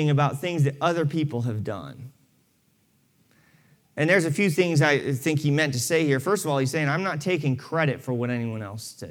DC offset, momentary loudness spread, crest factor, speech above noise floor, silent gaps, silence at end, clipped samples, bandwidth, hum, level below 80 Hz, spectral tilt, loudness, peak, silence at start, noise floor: under 0.1%; 13 LU; 18 dB; 42 dB; none; 0 s; under 0.1%; 17 kHz; none; -72 dBFS; -5.5 dB/octave; -24 LUFS; -6 dBFS; 0 s; -66 dBFS